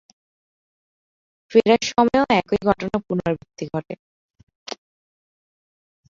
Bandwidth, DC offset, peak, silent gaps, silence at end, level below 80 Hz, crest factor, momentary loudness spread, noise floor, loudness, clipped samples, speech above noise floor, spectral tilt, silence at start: 7.6 kHz; under 0.1%; -2 dBFS; 3.99-4.29 s, 4.43-4.47 s, 4.55-4.66 s; 1.35 s; -52 dBFS; 22 dB; 20 LU; under -90 dBFS; -20 LUFS; under 0.1%; over 70 dB; -5.5 dB/octave; 1.5 s